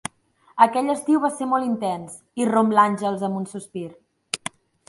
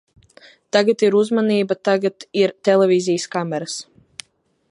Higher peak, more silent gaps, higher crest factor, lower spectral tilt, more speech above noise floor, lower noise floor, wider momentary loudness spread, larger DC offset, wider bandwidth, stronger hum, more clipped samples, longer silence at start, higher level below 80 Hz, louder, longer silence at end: about the same, -2 dBFS vs -2 dBFS; neither; about the same, 20 dB vs 18 dB; about the same, -5 dB/octave vs -5 dB/octave; about the same, 37 dB vs 40 dB; about the same, -59 dBFS vs -58 dBFS; about the same, 17 LU vs 17 LU; neither; about the same, 11.5 kHz vs 11.5 kHz; neither; neither; second, 0.55 s vs 0.75 s; about the same, -68 dBFS vs -70 dBFS; second, -22 LUFS vs -18 LUFS; second, 0.5 s vs 0.9 s